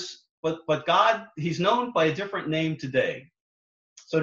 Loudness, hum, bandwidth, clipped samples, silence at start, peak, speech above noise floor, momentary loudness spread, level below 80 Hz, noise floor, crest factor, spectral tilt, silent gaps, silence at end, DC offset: -25 LUFS; none; 7.6 kHz; under 0.1%; 0 s; -8 dBFS; over 65 dB; 10 LU; -66 dBFS; under -90 dBFS; 20 dB; -5.5 dB/octave; 0.29-0.43 s, 3.41-3.96 s; 0 s; under 0.1%